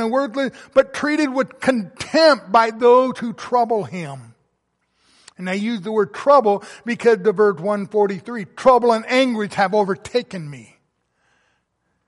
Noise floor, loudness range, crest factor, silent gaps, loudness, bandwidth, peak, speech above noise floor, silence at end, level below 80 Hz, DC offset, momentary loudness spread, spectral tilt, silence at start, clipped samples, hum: -70 dBFS; 4 LU; 16 dB; none; -18 LUFS; 11.5 kHz; -2 dBFS; 52 dB; 1.45 s; -60 dBFS; under 0.1%; 14 LU; -5 dB/octave; 0 s; under 0.1%; none